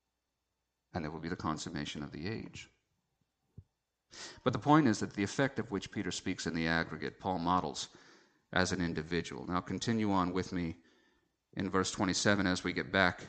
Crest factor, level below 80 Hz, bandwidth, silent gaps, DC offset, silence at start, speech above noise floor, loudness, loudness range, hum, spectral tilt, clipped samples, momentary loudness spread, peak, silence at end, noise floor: 24 dB; -62 dBFS; 9 kHz; none; under 0.1%; 0.95 s; 52 dB; -34 LUFS; 9 LU; none; -4.5 dB/octave; under 0.1%; 12 LU; -12 dBFS; 0 s; -86 dBFS